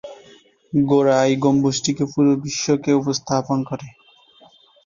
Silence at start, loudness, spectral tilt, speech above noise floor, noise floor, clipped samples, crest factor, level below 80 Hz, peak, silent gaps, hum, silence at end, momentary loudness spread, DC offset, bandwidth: 0.05 s; -19 LUFS; -5.5 dB/octave; 33 dB; -51 dBFS; under 0.1%; 16 dB; -56 dBFS; -4 dBFS; none; none; 0.95 s; 8 LU; under 0.1%; 7.4 kHz